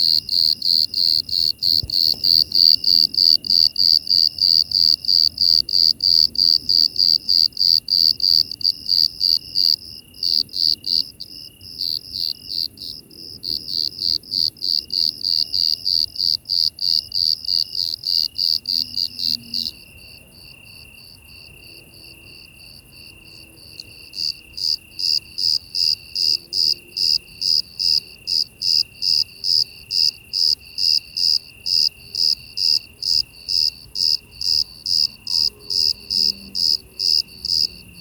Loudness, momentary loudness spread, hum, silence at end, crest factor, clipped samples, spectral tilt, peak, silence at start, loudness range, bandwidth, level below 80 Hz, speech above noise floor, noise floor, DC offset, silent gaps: -16 LUFS; 10 LU; none; 0 s; 20 dB; under 0.1%; 0 dB/octave; 0 dBFS; 0 s; 10 LU; over 20 kHz; -54 dBFS; 26 dB; -44 dBFS; under 0.1%; none